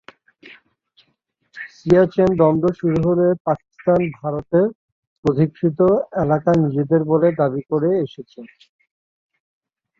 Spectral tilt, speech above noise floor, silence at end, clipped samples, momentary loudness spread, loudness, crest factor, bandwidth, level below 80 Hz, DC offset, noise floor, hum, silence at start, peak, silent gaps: -9.5 dB/octave; 51 dB; 1.55 s; under 0.1%; 9 LU; -18 LUFS; 18 dB; 7.2 kHz; -50 dBFS; under 0.1%; -68 dBFS; none; 0.45 s; -2 dBFS; 3.40-3.45 s, 4.75-5.23 s